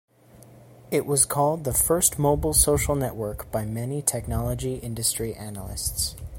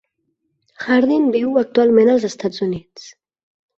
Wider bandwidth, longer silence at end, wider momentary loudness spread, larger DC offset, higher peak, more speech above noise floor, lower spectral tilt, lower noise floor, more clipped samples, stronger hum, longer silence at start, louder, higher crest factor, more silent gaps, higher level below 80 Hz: first, 16.5 kHz vs 7.8 kHz; second, 0 s vs 0.7 s; about the same, 11 LU vs 11 LU; neither; about the same, -4 dBFS vs -2 dBFS; second, 26 dB vs 55 dB; second, -4 dB/octave vs -6 dB/octave; second, -51 dBFS vs -71 dBFS; neither; neither; second, 0.35 s vs 0.8 s; second, -24 LUFS vs -16 LUFS; first, 22 dB vs 16 dB; neither; first, -38 dBFS vs -60 dBFS